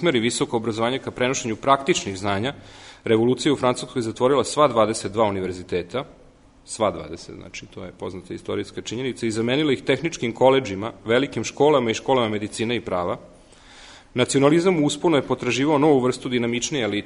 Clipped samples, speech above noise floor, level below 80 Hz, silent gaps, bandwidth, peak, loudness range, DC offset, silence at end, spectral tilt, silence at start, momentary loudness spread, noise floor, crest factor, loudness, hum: under 0.1%; 25 dB; -54 dBFS; none; 11 kHz; -2 dBFS; 7 LU; under 0.1%; 0 s; -4.5 dB/octave; 0 s; 15 LU; -47 dBFS; 20 dB; -22 LUFS; none